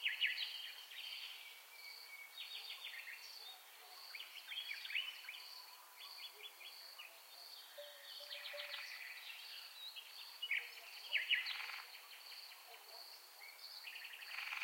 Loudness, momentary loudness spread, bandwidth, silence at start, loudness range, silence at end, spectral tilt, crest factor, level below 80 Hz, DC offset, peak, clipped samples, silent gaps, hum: -47 LUFS; 14 LU; 16.5 kHz; 0 s; 8 LU; 0 s; 5.5 dB/octave; 24 dB; under -90 dBFS; under 0.1%; -24 dBFS; under 0.1%; none; none